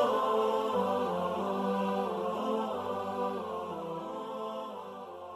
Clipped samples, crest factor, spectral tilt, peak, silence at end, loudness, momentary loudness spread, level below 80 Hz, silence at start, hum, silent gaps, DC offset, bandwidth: under 0.1%; 16 dB; -6.5 dB/octave; -18 dBFS; 0 s; -33 LUFS; 10 LU; -76 dBFS; 0 s; none; none; under 0.1%; 14 kHz